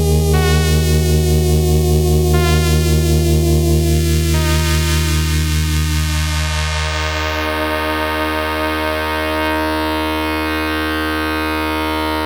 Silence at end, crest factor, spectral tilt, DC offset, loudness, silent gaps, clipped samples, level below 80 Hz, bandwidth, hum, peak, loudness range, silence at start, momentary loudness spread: 0 s; 14 dB; -5 dB/octave; under 0.1%; -16 LUFS; none; under 0.1%; -20 dBFS; 19 kHz; none; 0 dBFS; 4 LU; 0 s; 4 LU